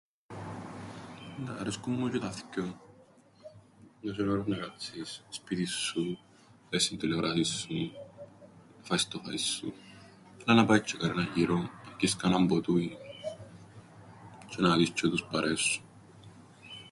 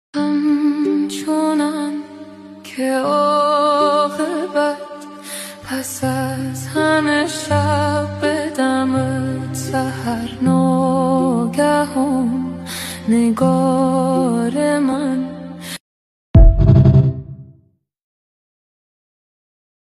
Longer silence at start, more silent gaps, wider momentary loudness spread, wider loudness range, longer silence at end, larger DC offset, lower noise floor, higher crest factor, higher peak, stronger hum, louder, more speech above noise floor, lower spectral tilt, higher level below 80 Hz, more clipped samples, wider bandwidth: first, 0.3 s vs 0.15 s; second, none vs 15.80-16.34 s; first, 22 LU vs 14 LU; first, 9 LU vs 3 LU; second, 0 s vs 2.45 s; neither; about the same, -59 dBFS vs -56 dBFS; first, 24 dB vs 16 dB; second, -10 dBFS vs 0 dBFS; neither; second, -31 LUFS vs -17 LUFS; second, 29 dB vs 39 dB; second, -4.5 dB/octave vs -6.5 dB/octave; second, -62 dBFS vs -26 dBFS; neither; second, 11.5 kHz vs 14 kHz